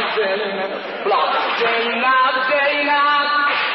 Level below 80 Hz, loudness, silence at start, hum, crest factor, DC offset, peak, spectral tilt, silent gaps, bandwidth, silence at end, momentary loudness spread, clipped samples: -72 dBFS; -17 LUFS; 0 s; none; 12 dB; under 0.1%; -6 dBFS; -4.5 dB/octave; none; 6 kHz; 0 s; 7 LU; under 0.1%